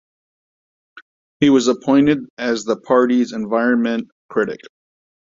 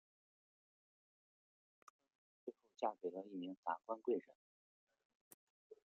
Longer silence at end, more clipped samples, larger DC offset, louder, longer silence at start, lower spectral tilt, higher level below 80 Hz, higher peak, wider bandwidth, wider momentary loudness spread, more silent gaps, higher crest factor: first, 0.7 s vs 0.15 s; neither; neither; first, -17 LUFS vs -46 LUFS; second, 0.95 s vs 2.45 s; about the same, -5.5 dB/octave vs -4.5 dB/octave; first, -58 dBFS vs under -90 dBFS; first, -2 dBFS vs -26 dBFS; about the same, 7.6 kHz vs 7 kHz; second, 9 LU vs 14 LU; second, 1.02-1.40 s, 2.30-2.37 s, 4.12-4.29 s vs 3.57-3.63 s, 4.35-4.87 s, 5.05-5.70 s; second, 18 dB vs 24 dB